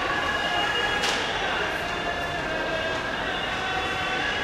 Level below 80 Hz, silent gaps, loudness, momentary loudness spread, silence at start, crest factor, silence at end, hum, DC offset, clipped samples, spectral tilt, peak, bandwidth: -46 dBFS; none; -25 LUFS; 4 LU; 0 s; 14 dB; 0 s; none; under 0.1%; under 0.1%; -3 dB/octave; -12 dBFS; 15 kHz